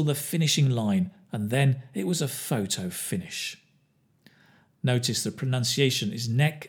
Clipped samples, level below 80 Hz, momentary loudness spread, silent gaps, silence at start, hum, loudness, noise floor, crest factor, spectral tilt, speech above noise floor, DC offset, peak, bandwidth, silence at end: under 0.1%; -70 dBFS; 9 LU; none; 0 s; none; -27 LUFS; -66 dBFS; 20 dB; -4.5 dB/octave; 40 dB; under 0.1%; -8 dBFS; 19.5 kHz; 0 s